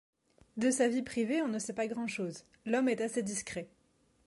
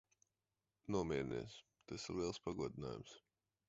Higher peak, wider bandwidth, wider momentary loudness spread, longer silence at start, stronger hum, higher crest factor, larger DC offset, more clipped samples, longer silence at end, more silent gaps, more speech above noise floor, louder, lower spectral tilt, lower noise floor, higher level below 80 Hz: first, -18 dBFS vs -26 dBFS; first, 11.5 kHz vs 7.6 kHz; second, 13 LU vs 17 LU; second, 0.55 s vs 0.85 s; neither; second, 16 dB vs 22 dB; neither; neither; about the same, 0.6 s vs 0.5 s; neither; second, 38 dB vs over 46 dB; first, -34 LUFS vs -45 LUFS; second, -4 dB/octave vs -5.5 dB/octave; second, -71 dBFS vs under -90 dBFS; second, -72 dBFS vs -66 dBFS